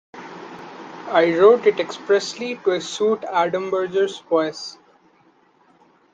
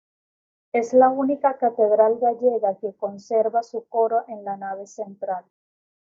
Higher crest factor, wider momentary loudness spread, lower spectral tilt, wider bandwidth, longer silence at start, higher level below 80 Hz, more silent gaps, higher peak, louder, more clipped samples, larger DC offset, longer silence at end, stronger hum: about the same, 20 dB vs 18 dB; first, 23 LU vs 15 LU; second, -4 dB/octave vs -6 dB/octave; first, 9 kHz vs 7.6 kHz; second, 0.15 s vs 0.75 s; first, -70 dBFS vs -76 dBFS; neither; about the same, -2 dBFS vs -4 dBFS; about the same, -20 LUFS vs -22 LUFS; neither; neither; first, 1.4 s vs 0.7 s; neither